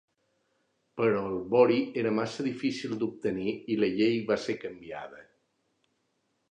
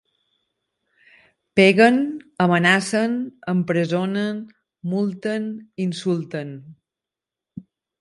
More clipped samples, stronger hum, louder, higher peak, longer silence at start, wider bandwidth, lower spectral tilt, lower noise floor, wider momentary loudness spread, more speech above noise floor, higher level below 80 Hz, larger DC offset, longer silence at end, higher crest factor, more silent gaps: neither; neither; second, -29 LUFS vs -20 LUFS; second, -10 dBFS vs -2 dBFS; second, 0.95 s vs 1.55 s; second, 9.8 kHz vs 11.5 kHz; about the same, -6.5 dB/octave vs -6 dB/octave; second, -76 dBFS vs -88 dBFS; about the same, 17 LU vs 15 LU; second, 48 dB vs 68 dB; about the same, -68 dBFS vs -66 dBFS; neither; first, 1.3 s vs 0.4 s; about the same, 20 dB vs 20 dB; neither